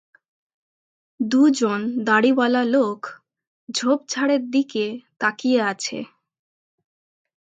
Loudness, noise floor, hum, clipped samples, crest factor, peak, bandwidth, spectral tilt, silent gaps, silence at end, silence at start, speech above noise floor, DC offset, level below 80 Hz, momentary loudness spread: -21 LUFS; under -90 dBFS; none; under 0.1%; 18 dB; -4 dBFS; 9.2 kHz; -4 dB/octave; 3.47-3.67 s; 1.4 s; 1.2 s; over 70 dB; under 0.1%; -74 dBFS; 12 LU